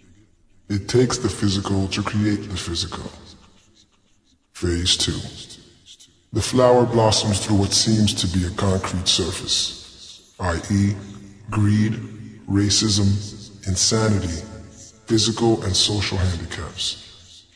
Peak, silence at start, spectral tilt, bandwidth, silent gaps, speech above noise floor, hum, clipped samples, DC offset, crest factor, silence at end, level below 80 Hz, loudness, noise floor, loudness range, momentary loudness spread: -4 dBFS; 0.7 s; -4.5 dB/octave; 11 kHz; none; 40 dB; none; under 0.1%; under 0.1%; 18 dB; 0.15 s; -42 dBFS; -20 LUFS; -60 dBFS; 7 LU; 18 LU